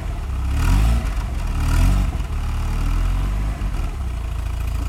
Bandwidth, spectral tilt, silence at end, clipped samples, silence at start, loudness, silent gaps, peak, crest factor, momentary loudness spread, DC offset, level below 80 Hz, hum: 14.5 kHz; -6 dB/octave; 0 s; under 0.1%; 0 s; -23 LUFS; none; -6 dBFS; 14 dB; 8 LU; under 0.1%; -20 dBFS; none